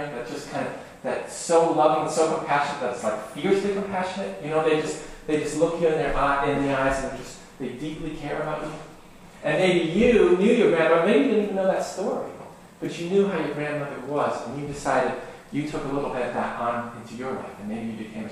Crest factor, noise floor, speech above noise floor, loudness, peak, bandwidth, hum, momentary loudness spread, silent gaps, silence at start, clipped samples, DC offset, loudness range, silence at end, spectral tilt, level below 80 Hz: 18 dB; -46 dBFS; 22 dB; -24 LUFS; -6 dBFS; 13 kHz; none; 15 LU; none; 0 s; under 0.1%; under 0.1%; 7 LU; 0 s; -5.5 dB/octave; -46 dBFS